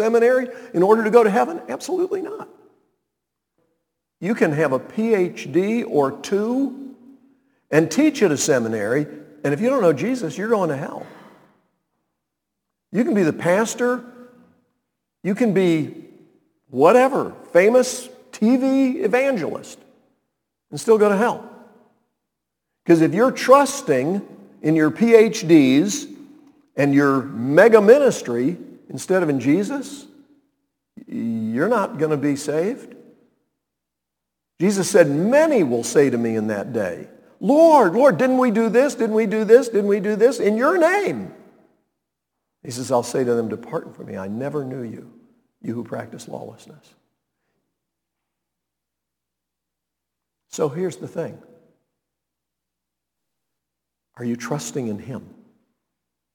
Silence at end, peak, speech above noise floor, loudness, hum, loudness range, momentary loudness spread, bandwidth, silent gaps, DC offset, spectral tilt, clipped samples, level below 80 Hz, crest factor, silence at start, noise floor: 1.15 s; 0 dBFS; 65 dB; -19 LUFS; none; 15 LU; 18 LU; 19 kHz; none; under 0.1%; -5.5 dB/octave; under 0.1%; -72 dBFS; 20 dB; 0 s; -83 dBFS